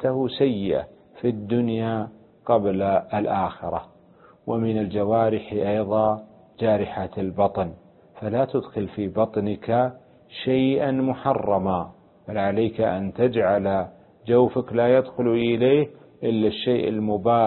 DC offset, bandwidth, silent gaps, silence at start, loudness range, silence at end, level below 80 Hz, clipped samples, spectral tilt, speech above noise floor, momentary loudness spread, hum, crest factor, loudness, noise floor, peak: under 0.1%; 4.3 kHz; none; 0 s; 4 LU; 0 s; -52 dBFS; under 0.1%; -11.5 dB/octave; 31 dB; 10 LU; none; 16 dB; -23 LUFS; -53 dBFS; -6 dBFS